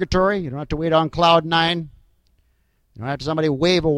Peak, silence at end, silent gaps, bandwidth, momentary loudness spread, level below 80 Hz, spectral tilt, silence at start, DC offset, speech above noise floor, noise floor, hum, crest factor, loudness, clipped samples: -2 dBFS; 0 s; none; 11 kHz; 12 LU; -40 dBFS; -5.5 dB/octave; 0 s; under 0.1%; 45 dB; -64 dBFS; none; 20 dB; -19 LUFS; under 0.1%